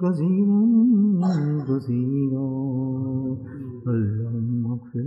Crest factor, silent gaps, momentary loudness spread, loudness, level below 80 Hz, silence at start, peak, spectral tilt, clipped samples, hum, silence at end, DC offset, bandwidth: 12 dB; none; 10 LU; -23 LUFS; -64 dBFS; 0 s; -10 dBFS; -11 dB/octave; under 0.1%; none; 0 s; under 0.1%; 6 kHz